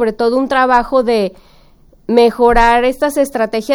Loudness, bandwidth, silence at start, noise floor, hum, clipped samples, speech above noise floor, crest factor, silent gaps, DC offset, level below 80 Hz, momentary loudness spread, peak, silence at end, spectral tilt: -13 LUFS; over 20 kHz; 0 s; -46 dBFS; none; under 0.1%; 33 dB; 12 dB; none; under 0.1%; -30 dBFS; 7 LU; 0 dBFS; 0 s; -4.5 dB/octave